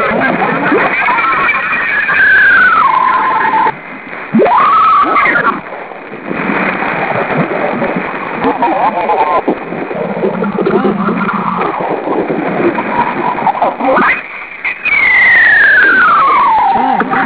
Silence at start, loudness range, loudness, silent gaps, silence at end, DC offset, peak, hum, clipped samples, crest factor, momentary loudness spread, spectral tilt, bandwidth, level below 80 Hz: 0 s; 7 LU; -10 LUFS; none; 0 s; 0.4%; 0 dBFS; none; under 0.1%; 10 dB; 12 LU; -8.5 dB/octave; 4 kHz; -48 dBFS